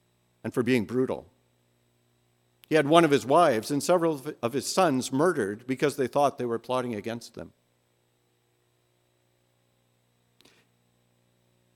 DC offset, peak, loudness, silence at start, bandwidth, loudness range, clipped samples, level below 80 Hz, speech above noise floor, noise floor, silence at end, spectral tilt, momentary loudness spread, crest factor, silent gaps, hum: under 0.1%; -4 dBFS; -26 LUFS; 0.45 s; 16.5 kHz; 12 LU; under 0.1%; -74 dBFS; 45 dB; -70 dBFS; 4.3 s; -5 dB/octave; 16 LU; 24 dB; none; 60 Hz at -60 dBFS